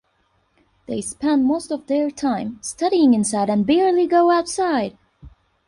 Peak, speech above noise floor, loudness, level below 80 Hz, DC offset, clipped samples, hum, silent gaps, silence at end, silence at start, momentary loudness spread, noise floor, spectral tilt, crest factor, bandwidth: -6 dBFS; 46 dB; -19 LUFS; -56 dBFS; under 0.1%; under 0.1%; none; none; 0.4 s; 0.9 s; 11 LU; -65 dBFS; -5 dB/octave; 14 dB; 11.5 kHz